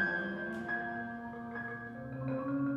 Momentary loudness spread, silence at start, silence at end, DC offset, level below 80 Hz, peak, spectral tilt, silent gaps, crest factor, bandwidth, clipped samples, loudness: 8 LU; 0 s; 0 s; under 0.1%; -66 dBFS; -22 dBFS; -8 dB/octave; none; 16 dB; 7.6 kHz; under 0.1%; -38 LUFS